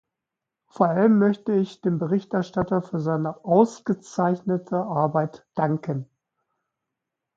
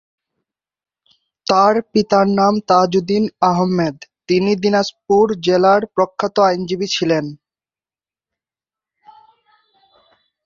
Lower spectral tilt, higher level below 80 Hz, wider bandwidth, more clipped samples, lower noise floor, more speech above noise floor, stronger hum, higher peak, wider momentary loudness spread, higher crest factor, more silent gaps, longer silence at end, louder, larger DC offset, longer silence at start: first, -8.5 dB/octave vs -5.5 dB/octave; about the same, -62 dBFS vs -58 dBFS; about the same, 7.6 kHz vs 7.4 kHz; neither; second, -86 dBFS vs under -90 dBFS; second, 63 dB vs over 75 dB; neither; about the same, -4 dBFS vs -2 dBFS; about the same, 8 LU vs 7 LU; about the same, 20 dB vs 16 dB; neither; second, 1.35 s vs 3.1 s; second, -24 LUFS vs -16 LUFS; neither; second, 0.8 s vs 1.45 s